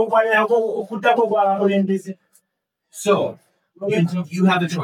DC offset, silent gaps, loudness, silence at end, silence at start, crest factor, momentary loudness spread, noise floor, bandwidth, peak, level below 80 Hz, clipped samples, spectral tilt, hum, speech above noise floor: under 0.1%; none; -19 LUFS; 0 s; 0 s; 16 dB; 12 LU; -77 dBFS; 14 kHz; -4 dBFS; -78 dBFS; under 0.1%; -6 dB/octave; none; 59 dB